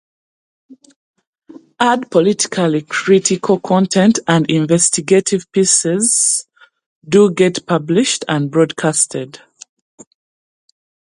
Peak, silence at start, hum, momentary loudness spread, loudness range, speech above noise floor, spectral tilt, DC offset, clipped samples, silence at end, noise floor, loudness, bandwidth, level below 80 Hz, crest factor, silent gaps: 0 dBFS; 0.7 s; none; 5 LU; 5 LU; over 76 dB; -4 dB/octave; under 0.1%; under 0.1%; 1.85 s; under -90 dBFS; -14 LUFS; 11.5 kHz; -60 dBFS; 16 dB; 0.96-1.14 s, 1.27-1.33 s, 6.86-7.01 s